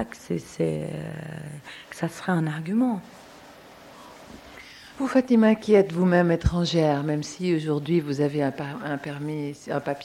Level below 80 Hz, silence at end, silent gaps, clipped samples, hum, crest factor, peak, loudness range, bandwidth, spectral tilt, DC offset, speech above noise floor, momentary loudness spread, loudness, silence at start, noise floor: -46 dBFS; 0 s; none; under 0.1%; none; 18 dB; -6 dBFS; 8 LU; 14 kHz; -7 dB/octave; under 0.1%; 23 dB; 21 LU; -25 LUFS; 0 s; -47 dBFS